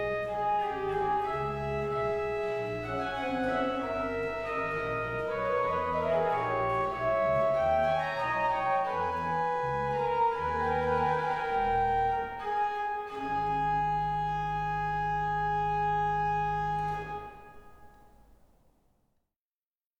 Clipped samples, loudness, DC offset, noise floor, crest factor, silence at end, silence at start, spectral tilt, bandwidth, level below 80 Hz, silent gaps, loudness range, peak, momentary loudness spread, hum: under 0.1%; -30 LUFS; under 0.1%; under -90 dBFS; 14 dB; 1.95 s; 0 s; -6.5 dB/octave; 9.8 kHz; -50 dBFS; none; 3 LU; -16 dBFS; 5 LU; none